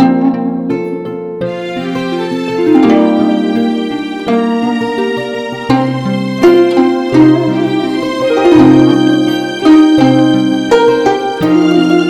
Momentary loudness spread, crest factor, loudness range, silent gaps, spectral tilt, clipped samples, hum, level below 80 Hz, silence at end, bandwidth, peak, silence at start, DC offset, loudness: 11 LU; 10 dB; 5 LU; none; -6.5 dB/octave; 0.6%; none; -46 dBFS; 0 s; 10 kHz; 0 dBFS; 0 s; under 0.1%; -11 LUFS